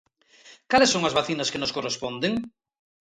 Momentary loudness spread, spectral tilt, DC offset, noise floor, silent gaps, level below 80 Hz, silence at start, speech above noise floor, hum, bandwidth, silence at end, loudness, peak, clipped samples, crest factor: 10 LU; -3 dB/octave; under 0.1%; -53 dBFS; none; -60 dBFS; 0.45 s; 29 dB; none; 11 kHz; 0.6 s; -24 LUFS; -6 dBFS; under 0.1%; 20 dB